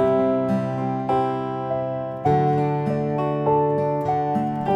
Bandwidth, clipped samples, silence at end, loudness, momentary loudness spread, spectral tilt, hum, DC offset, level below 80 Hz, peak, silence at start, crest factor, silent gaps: 8 kHz; under 0.1%; 0 s; -22 LUFS; 6 LU; -9.5 dB/octave; none; under 0.1%; -54 dBFS; -6 dBFS; 0 s; 16 dB; none